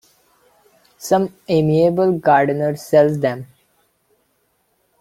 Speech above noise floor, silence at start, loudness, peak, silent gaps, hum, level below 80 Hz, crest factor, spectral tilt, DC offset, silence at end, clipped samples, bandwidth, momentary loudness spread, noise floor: 49 dB; 1 s; -17 LUFS; -2 dBFS; none; none; -56 dBFS; 16 dB; -7 dB/octave; under 0.1%; 1.55 s; under 0.1%; 16 kHz; 8 LU; -65 dBFS